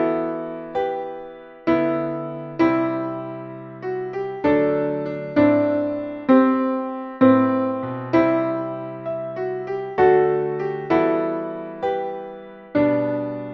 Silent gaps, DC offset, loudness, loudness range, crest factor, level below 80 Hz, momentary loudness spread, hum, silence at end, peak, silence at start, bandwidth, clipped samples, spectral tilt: none; under 0.1%; -21 LUFS; 5 LU; 18 dB; -58 dBFS; 14 LU; none; 0 s; -2 dBFS; 0 s; 6 kHz; under 0.1%; -9 dB/octave